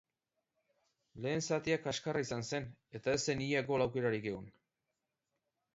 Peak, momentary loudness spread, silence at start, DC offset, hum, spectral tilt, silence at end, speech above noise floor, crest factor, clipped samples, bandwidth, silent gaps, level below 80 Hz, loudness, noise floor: -20 dBFS; 9 LU; 1.15 s; under 0.1%; none; -4.5 dB/octave; 1.25 s; 52 dB; 20 dB; under 0.1%; 7.6 kHz; none; -68 dBFS; -36 LUFS; -88 dBFS